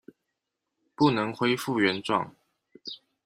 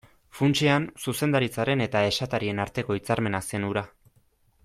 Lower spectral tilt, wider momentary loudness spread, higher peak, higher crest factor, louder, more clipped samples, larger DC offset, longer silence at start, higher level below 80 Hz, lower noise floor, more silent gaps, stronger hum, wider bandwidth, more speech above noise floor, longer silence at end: about the same, -5.5 dB/octave vs -5.5 dB/octave; first, 17 LU vs 7 LU; about the same, -8 dBFS vs -8 dBFS; about the same, 20 dB vs 18 dB; about the same, -26 LUFS vs -26 LUFS; neither; neither; first, 1 s vs 0.35 s; second, -68 dBFS vs -56 dBFS; first, -83 dBFS vs -64 dBFS; neither; neither; about the same, 15.5 kHz vs 15.5 kHz; first, 58 dB vs 39 dB; second, 0.3 s vs 0.75 s